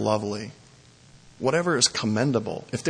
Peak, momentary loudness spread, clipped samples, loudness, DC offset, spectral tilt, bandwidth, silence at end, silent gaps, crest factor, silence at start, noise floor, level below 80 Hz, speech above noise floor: -6 dBFS; 12 LU; under 0.1%; -24 LUFS; under 0.1%; -4 dB/octave; 10.5 kHz; 0 s; none; 20 dB; 0 s; -53 dBFS; -62 dBFS; 28 dB